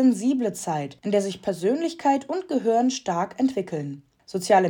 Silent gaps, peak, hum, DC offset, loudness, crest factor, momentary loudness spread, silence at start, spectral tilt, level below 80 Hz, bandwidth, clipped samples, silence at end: none; -6 dBFS; none; under 0.1%; -25 LUFS; 18 dB; 10 LU; 0 s; -5.5 dB/octave; -68 dBFS; 17 kHz; under 0.1%; 0 s